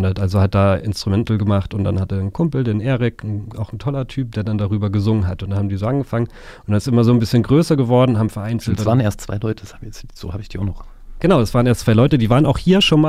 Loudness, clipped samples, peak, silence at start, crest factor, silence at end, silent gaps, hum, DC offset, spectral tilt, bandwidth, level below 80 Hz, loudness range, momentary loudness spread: -18 LUFS; under 0.1%; -2 dBFS; 0 s; 14 dB; 0 s; none; none; under 0.1%; -7 dB/octave; 14.5 kHz; -36 dBFS; 4 LU; 13 LU